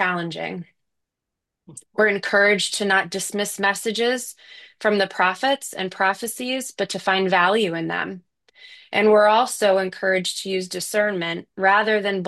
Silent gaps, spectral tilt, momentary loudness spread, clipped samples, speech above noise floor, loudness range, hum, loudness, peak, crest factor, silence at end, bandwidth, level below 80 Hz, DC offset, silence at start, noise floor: none; -3 dB/octave; 10 LU; under 0.1%; 62 dB; 3 LU; none; -21 LUFS; -4 dBFS; 18 dB; 0 s; 12.5 kHz; -72 dBFS; under 0.1%; 0 s; -84 dBFS